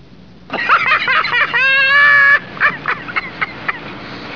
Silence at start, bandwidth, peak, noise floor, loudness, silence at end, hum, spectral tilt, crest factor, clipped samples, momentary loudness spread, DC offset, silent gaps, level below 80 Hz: 0.5 s; 5.4 kHz; -2 dBFS; -40 dBFS; -12 LUFS; 0 s; none; -3.5 dB/octave; 12 dB; under 0.1%; 16 LU; 0.6%; none; -50 dBFS